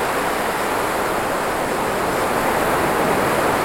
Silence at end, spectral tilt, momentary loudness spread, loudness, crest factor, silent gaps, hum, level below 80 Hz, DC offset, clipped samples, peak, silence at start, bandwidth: 0 s; -4 dB/octave; 3 LU; -20 LUFS; 16 dB; none; none; -42 dBFS; under 0.1%; under 0.1%; -4 dBFS; 0 s; 17.5 kHz